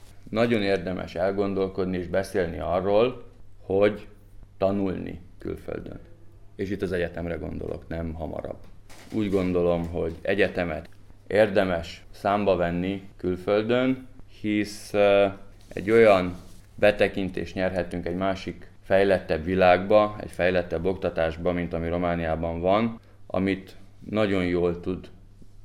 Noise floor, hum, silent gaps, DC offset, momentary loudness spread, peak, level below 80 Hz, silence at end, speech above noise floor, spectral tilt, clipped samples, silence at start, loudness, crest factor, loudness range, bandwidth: -46 dBFS; none; none; under 0.1%; 14 LU; -6 dBFS; -46 dBFS; 0 s; 21 dB; -7 dB/octave; under 0.1%; 0 s; -25 LUFS; 20 dB; 8 LU; 13.5 kHz